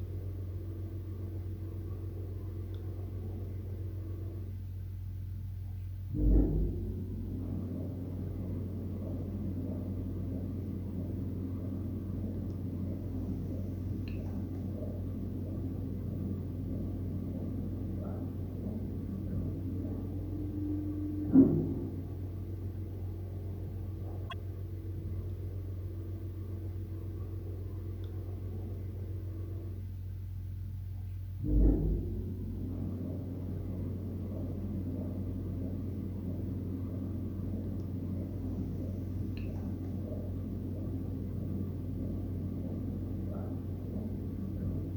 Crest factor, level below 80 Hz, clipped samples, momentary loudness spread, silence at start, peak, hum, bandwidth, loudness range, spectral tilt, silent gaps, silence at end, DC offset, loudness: 24 dB; -42 dBFS; under 0.1%; 5 LU; 0 s; -12 dBFS; none; over 20 kHz; 9 LU; -10.5 dB/octave; none; 0 s; under 0.1%; -38 LUFS